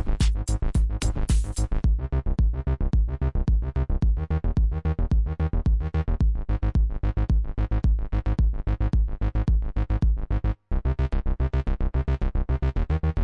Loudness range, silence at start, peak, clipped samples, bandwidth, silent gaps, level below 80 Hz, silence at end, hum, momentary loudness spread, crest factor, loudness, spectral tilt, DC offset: 1 LU; 0 s; -12 dBFS; under 0.1%; 11 kHz; none; -24 dBFS; 0 s; none; 3 LU; 10 dB; -26 LUFS; -7 dB/octave; under 0.1%